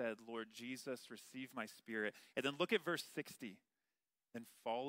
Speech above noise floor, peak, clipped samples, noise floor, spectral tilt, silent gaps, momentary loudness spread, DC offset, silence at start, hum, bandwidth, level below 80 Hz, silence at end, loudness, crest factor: over 45 dB; -22 dBFS; under 0.1%; under -90 dBFS; -4 dB/octave; none; 15 LU; under 0.1%; 0 s; none; 16 kHz; under -90 dBFS; 0 s; -45 LUFS; 22 dB